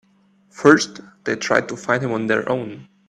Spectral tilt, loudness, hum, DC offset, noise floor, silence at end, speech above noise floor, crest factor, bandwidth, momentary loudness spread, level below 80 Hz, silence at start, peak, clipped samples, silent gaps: -4.5 dB/octave; -19 LUFS; none; under 0.1%; -57 dBFS; 0.25 s; 38 dB; 20 dB; 11 kHz; 13 LU; -62 dBFS; 0.55 s; 0 dBFS; under 0.1%; none